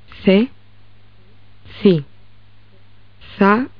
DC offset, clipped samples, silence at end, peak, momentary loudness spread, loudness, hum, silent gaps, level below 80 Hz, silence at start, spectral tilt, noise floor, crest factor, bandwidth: 0.9%; under 0.1%; 0.1 s; 0 dBFS; 19 LU; -16 LUFS; 50 Hz at -40 dBFS; none; -52 dBFS; 0.2 s; -5.5 dB/octave; -49 dBFS; 18 dB; 5.2 kHz